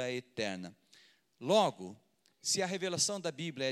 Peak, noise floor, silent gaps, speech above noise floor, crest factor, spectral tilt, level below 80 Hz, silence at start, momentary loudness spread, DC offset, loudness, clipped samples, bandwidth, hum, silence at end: -14 dBFS; -65 dBFS; none; 31 dB; 22 dB; -3 dB/octave; -86 dBFS; 0 s; 17 LU; under 0.1%; -34 LUFS; under 0.1%; 14.5 kHz; none; 0 s